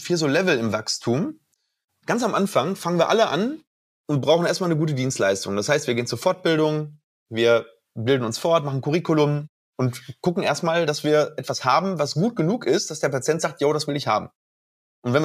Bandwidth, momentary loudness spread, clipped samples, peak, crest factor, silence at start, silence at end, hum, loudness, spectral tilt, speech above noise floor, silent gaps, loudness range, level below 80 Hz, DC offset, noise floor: 15.5 kHz; 8 LU; under 0.1%; -4 dBFS; 18 dB; 0 s; 0 s; none; -22 LUFS; -5 dB/octave; over 68 dB; 1.84-1.88 s, 3.67-4.04 s, 7.04-7.26 s, 9.49-9.73 s, 14.35-15.02 s; 1 LU; -68 dBFS; under 0.1%; under -90 dBFS